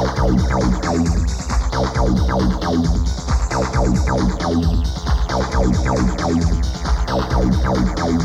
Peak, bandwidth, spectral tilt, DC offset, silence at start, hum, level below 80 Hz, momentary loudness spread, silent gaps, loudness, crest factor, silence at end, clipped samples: -4 dBFS; 10.5 kHz; -6.5 dB/octave; under 0.1%; 0 s; none; -20 dBFS; 4 LU; none; -19 LUFS; 12 dB; 0 s; under 0.1%